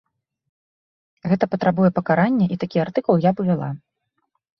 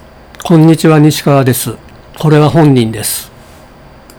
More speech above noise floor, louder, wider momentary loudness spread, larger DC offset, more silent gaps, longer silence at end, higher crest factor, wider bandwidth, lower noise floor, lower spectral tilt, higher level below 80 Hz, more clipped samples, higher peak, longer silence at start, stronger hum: first, 54 dB vs 29 dB; second, -20 LUFS vs -9 LUFS; second, 8 LU vs 13 LU; neither; neither; about the same, 0.85 s vs 0.9 s; first, 18 dB vs 10 dB; second, 6 kHz vs over 20 kHz; first, -73 dBFS vs -36 dBFS; first, -10 dB/octave vs -6 dB/octave; second, -60 dBFS vs -40 dBFS; second, under 0.1% vs 1%; about the same, -2 dBFS vs 0 dBFS; first, 1.25 s vs 0.4 s; neither